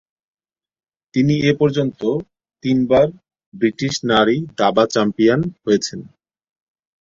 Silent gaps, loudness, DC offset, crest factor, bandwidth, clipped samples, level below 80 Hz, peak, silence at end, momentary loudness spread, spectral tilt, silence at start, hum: 3.46-3.52 s; -18 LUFS; under 0.1%; 18 dB; 7.6 kHz; under 0.1%; -52 dBFS; -2 dBFS; 0.95 s; 7 LU; -6 dB/octave; 1.15 s; none